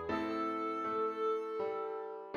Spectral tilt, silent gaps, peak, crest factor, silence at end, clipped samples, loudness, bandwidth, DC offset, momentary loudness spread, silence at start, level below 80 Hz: -6.5 dB/octave; none; -24 dBFS; 12 dB; 0 s; under 0.1%; -37 LUFS; 7 kHz; under 0.1%; 5 LU; 0 s; -70 dBFS